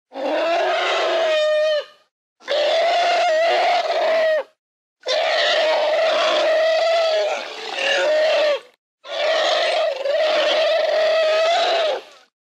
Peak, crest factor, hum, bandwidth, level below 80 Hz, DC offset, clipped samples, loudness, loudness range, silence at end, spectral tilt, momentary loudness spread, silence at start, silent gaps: -8 dBFS; 12 dB; none; 9.8 kHz; -82 dBFS; under 0.1%; under 0.1%; -18 LUFS; 1 LU; 0.5 s; 0 dB/octave; 7 LU; 0.15 s; 2.11-2.36 s, 4.59-4.96 s, 8.78-8.98 s